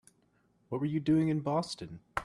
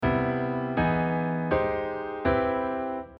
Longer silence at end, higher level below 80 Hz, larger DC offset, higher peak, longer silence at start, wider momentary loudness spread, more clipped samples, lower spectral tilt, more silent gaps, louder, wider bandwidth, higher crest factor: about the same, 0 s vs 0.05 s; second, -62 dBFS vs -46 dBFS; neither; about the same, -14 dBFS vs -12 dBFS; first, 0.7 s vs 0 s; first, 12 LU vs 6 LU; neither; second, -7 dB/octave vs -10 dB/octave; neither; second, -32 LUFS vs -27 LUFS; first, 11 kHz vs 5.4 kHz; about the same, 20 dB vs 16 dB